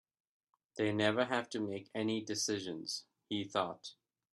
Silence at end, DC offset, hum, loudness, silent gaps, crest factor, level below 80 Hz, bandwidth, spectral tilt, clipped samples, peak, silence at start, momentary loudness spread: 0.4 s; under 0.1%; none; -37 LUFS; none; 22 dB; -78 dBFS; 13 kHz; -3.5 dB/octave; under 0.1%; -16 dBFS; 0.75 s; 11 LU